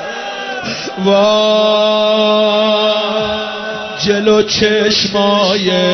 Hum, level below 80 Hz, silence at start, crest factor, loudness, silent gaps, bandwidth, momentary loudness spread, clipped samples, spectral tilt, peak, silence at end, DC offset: none; -46 dBFS; 0 s; 12 dB; -12 LUFS; none; 6.4 kHz; 10 LU; under 0.1%; -4 dB/octave; -2 dBFS; 0 s; under 0.1%